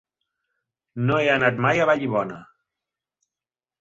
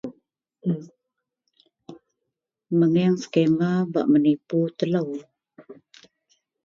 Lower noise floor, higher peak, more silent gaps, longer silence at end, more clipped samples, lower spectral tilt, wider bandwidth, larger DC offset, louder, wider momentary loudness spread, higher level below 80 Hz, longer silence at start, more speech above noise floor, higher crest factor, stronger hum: first, under -90 dBFS vs -83 dBFS; about the same, -6 dBFS vs -6 dBFS; neither; first, 1.35 s vs 0.9 s; neither; second, -6.5 dB/octave vs -8 dB/octave; about the same, 7.8 kHz vs 7.4 kHz; neither; about the same, -21 LUFS vs -23 LUFS; first, 16 LU vs 12 LU; first, -60 dBFS vs -70 dBFS; first, 0.95 s vs 0.05 s; first, over 69 dB vs 61 dB; about the same, 20 dB vs 18 dB; neither